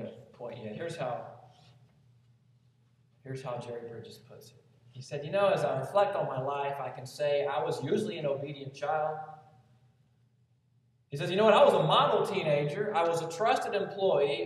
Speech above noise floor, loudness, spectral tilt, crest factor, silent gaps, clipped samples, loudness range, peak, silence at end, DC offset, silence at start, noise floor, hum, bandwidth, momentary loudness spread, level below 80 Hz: 39 dB; -30 LUFS; -5.5 dB/octave; 22 dB; none; under 0.1%; 17 LU; -10 dBFS; 0 s; under 0.1%; 0 s; -69 dBFS; none; 13 kHz; 19 LU; -78 dBFS